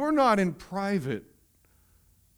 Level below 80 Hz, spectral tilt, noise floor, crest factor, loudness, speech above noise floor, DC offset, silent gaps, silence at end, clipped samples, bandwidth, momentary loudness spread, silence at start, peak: -60 dBFS; -6.5 dB/octave; -63 dBFS; 18 dB; -27 LUFS; 37 dB; under 0.1%; none; 1.15 s; under 0.1%; over 20 kHz; 13 LU; 0 s; -10 dBFS